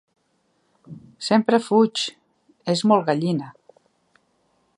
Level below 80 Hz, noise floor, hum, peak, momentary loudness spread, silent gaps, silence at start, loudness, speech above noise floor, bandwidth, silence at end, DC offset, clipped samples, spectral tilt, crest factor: -72 dBFS; -68 dBFS; none; -4 dBFS; 13 LU; none; 0.9 s; -21 LUFS; 48 dB; 11 kHz; 1.25 s; under 0.1%; under 0.1%; -5.5 dB/octave; 20 dB